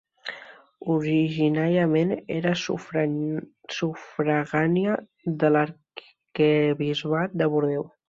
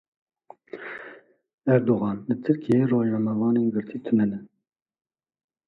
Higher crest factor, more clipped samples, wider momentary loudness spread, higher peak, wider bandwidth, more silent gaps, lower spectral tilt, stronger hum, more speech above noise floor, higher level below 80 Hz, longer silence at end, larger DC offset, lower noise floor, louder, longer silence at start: about the same, 18 dB vs 18 dB; neither; about the same, 15 LU vs 17 LU; about the same, -8 dBFS vs -8 dBFS; first, 7.4 kHz vs 4.7 kHz; second, none vs 1.54-1.58 s; second, -7 dB/octave vs -10.5 dB/octave; neither; second, 23 dB vs 58 dB; about the same, -66 dBFS vs -66 dBFS; second, 0.2 s vs 1.2 s; neither; second, -47 dBFS vs -81 dBFS; about the same, -24 LUFS vs -24 LUFS; second, 0.25 s vs 0.75 s